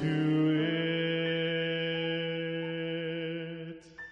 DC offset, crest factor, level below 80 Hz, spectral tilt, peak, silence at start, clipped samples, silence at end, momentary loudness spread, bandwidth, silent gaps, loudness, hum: under 0.1%; 12 dB; -70 dBFS; -7.5 dB/octave; -18 dBFS; 0 s; under 0.1%; 0 s; 12 LU; 6.2 kHz; none; -31 LUFS; none